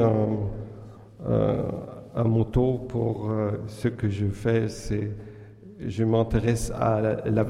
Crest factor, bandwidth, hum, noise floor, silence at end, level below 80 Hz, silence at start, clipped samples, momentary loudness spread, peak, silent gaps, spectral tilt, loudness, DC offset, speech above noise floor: 16 dB; 12.5 kHz; none; -45 dBFS; 0 s; -42 dBFS; 0 s; under 0.1%; 15 LU; -8 dBFS; none; -8 dB/octave; -26 LUFS; under 0.1%; 20 dB